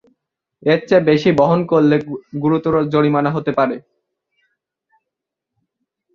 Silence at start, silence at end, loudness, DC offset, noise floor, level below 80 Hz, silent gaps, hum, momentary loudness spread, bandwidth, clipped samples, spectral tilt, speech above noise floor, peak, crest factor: 0.65 s; 2.35 s; -16 LUFS; under 0.1%; -82 dBFS; -54 dBFS; none; none; 7 LU; 7 kHz; under 0.1%; -8 dB/octave; 66 dB; 0 dBFS; 16 dB